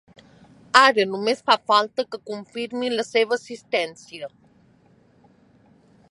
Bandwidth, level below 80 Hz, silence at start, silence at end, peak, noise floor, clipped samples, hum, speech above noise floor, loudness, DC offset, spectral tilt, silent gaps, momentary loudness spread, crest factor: 11.5 kHz; -70 dBFS; 0.75 s; 1.85 s; 0 dBFS; -57 dBFS; under 0.1%; none; 35 dB; -21 LUFS; under 0.1%; -2.5 dB/octave; none; 19 LU; 24 dB